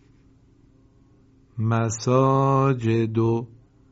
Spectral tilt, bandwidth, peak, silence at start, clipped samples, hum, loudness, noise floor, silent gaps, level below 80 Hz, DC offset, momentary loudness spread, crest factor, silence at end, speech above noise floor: -8 dB/octave; 8 kHz; -6 dBFS; 1.55 s; under 0.1%; none; -22 LUFS; -56 dBFS; none; -58 dBFS; under 0.1%; 10 LU; 18 dB; 0.45 s; 35 dB